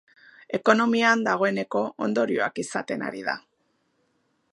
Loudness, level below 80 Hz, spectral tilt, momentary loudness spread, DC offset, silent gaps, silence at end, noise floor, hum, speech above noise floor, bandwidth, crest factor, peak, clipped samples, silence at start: -24 LUFS; -74 dBFS; -4.5 dB/octave; 11 LU; under 0.1%; none; 1.15 s; -71 dBFS; none; 47 dB; 11.5 kHz; 22 dB; -4 dBFS; under 0.1%; 0.5 s